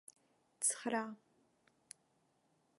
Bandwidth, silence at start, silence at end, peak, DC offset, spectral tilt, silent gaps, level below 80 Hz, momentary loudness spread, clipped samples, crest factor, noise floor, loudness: 12 kHz; 0.6 s; 1.65 s; -20 dBFS; under 0.1%; -1.5 dB/octave; none; under -90 dBFS; 23 LU; under 0.1%; 24 dB; -77 dBFS; -38 LUFS